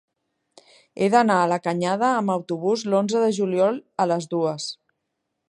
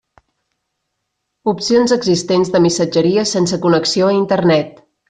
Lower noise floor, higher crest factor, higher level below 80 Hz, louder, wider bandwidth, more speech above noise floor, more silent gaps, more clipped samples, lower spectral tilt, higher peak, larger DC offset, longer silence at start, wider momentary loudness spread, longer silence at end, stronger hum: first, -78 dBFS vs -73 dBFS; first, 20 dB vs 12 dB; second, -74 dBFS vs -54 dBFS; second, -22 LUFS vs -14 LUFS; first, 11.5 kHz vs 9.8 kHz; about the same, 57 dB vs 60 dB; neither; neither; about the same, -5.5 dB/octave vs -5 dB/octave; about the same, -4 dBFS vs -2 dBFS; neither; second, 0.95 s vs 1.45 s; about the same, 7 LU vs 5 LU; first, 0.75 s vs 0.4 s; neither